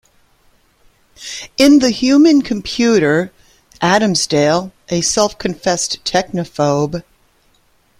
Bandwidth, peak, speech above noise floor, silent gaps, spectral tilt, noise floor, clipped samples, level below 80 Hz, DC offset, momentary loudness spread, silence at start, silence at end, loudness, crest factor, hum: 15 kHz; 0 dBFS; 42 dB; none; -4 dB/octave; -56 dBFS; under 0.1%; -48 dBFS; under 0.1%; 13 LU; 1.2 s; 1 s; -14 LUFS; 16 dB; none